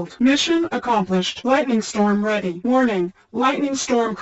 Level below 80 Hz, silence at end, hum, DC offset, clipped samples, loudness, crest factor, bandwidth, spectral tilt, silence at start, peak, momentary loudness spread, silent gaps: -58 dBFS; 0 s; none; under 0.1%; under 0.1%; -20 LUFS; 16 dB; 8.2 kHz; -4.5 dB/octave; 0 s; -4 dBFS; 4 LU; none